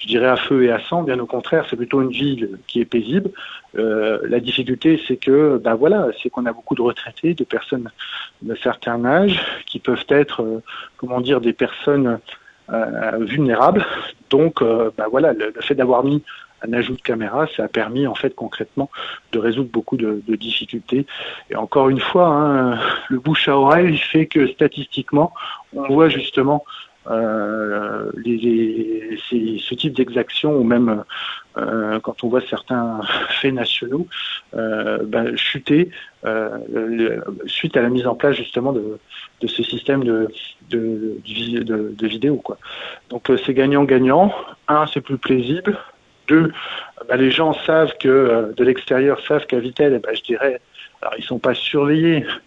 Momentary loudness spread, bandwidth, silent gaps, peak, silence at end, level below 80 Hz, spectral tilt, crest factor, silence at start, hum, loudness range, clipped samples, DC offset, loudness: 11 LU; 7.6 kHz; none; 0 dBFS; 0.05 s; -56 dBFS; -7.5 dB/octave; 18 dB; 0 s; none; 5 LU; under 0.1%; under 0.1%; -19 LUFS